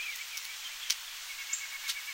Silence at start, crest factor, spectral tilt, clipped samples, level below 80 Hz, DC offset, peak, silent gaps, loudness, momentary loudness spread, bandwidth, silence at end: 0 s; 28 dB; 5.5 dB/octave; under 0.1%; -72 dBFS; under 0.1%; -10 dBFS; none; -36 LUFS; 5 LU; 17 kHz; 0 s